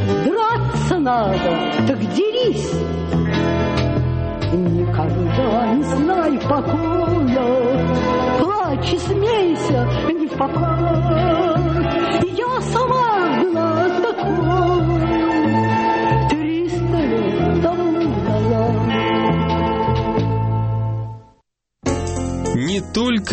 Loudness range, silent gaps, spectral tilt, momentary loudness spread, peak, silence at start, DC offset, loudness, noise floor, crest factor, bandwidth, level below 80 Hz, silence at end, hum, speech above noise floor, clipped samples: 2 LU; none; -7 dB/octave; 4 LU; -4 dBFS; 0 s; under 0.1%; -18 LUFS; -63 dBFS; 14 dB; 8.8 kHz; -34 dBFS; 0 s; none; 46 dB; under 0.1%